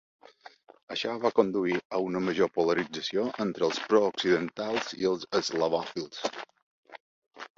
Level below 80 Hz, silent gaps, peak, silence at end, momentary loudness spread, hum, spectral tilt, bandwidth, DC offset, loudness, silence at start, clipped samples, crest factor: -70 dBFS; 0.83-0.87 s, 1.85-1.90 s, 6.62-6.83 s, 7.00-7.31 s; -8 dBFS; 0.1 s; 10 LU; none; -4.5 dB/octave; 7.8 kHz; under 0.1%; -29 LUFS; 0.45 s; under 0.1%; 22 dB